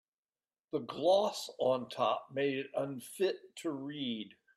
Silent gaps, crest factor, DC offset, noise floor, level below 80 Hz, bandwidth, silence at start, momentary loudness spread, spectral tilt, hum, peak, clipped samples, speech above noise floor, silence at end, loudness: none; 18 dB; under 0.1%; under -90 dBFS; -82 dBFS; 15 kHz; 0.75 s; 11 LU; -4.5 dB/octave; none; -18 dBFS; under 0.1%; over 56 dB; 0.3 s; -35 LUFS